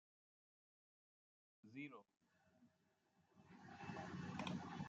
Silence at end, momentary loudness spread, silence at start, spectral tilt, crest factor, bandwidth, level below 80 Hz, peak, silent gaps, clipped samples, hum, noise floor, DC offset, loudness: 0 s; 16 LU; 1.65 s; -6 dB/octave; 22 dB; 8.4 kHz; -86 dBFS; -34 dBFS; none; under 0.1%; none; -82 dBFS; under 0.1%; -53 LUFS